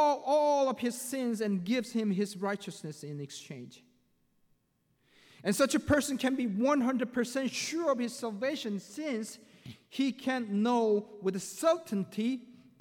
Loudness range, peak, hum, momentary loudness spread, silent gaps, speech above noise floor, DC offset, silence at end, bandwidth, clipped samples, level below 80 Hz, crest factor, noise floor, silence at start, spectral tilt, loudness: 7 LU; -16 dBFS; none; 14 LU; none; 43 dB; under 0.1%; 0.3 s; 19 kHz; under 0.1%; -64 dBFS; 16 dB; -74 dBFS; 0 s; -4.5 dB/octave; -31 LUFS